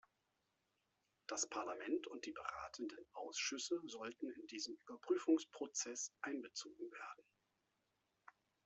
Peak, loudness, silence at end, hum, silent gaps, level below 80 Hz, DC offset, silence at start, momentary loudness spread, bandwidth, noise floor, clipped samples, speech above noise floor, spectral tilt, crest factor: -24 dBFS; -45 LUFS; 1.45 s; none; none; -86 dBFS; under 0.1%; 1.3 s; 13 LU; 8.2 kHz; -86 dBFS; under 0.1%; 41 dB; -1 dB/octave; 22 dB